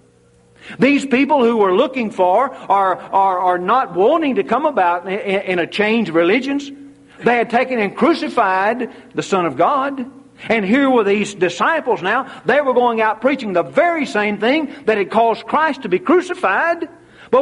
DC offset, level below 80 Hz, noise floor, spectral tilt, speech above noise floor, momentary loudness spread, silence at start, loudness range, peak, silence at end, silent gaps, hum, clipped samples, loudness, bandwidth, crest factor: under 0.1%; -60 dBFS; -52 dBFS; -5.5 dB/octave; 36 dB; 6 LU; 0.65 s; 2 LU; -2 dBFS; 0 s; none; none; under 0.1%; -16 LUFS; 11.5 kHz; 14 dB